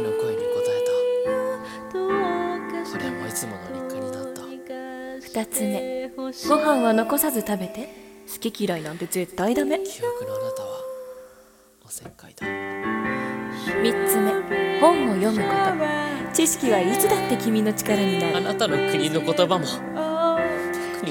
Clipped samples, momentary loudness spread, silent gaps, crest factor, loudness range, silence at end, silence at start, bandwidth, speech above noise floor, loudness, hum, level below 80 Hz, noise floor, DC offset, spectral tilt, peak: under 0.1%; 14 LU; none; 20 dB; 9 LU; 0 s; 0 s; 18 kHz; 31 dB; -24 LUFS; none; -58 dBFS; -53 dBFS; under 0.1%; -4 dB/octave; -2 dBFS